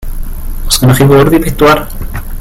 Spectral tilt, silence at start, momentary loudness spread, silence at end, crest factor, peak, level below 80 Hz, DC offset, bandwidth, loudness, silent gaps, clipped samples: -5.5 dB/octave; 0 s; 19 LU; 0 s; 8 dB; 0 dBFS; -18 dBFS; under 0.1%; 17.5 kHz; -8 LUFS; none; 0.7%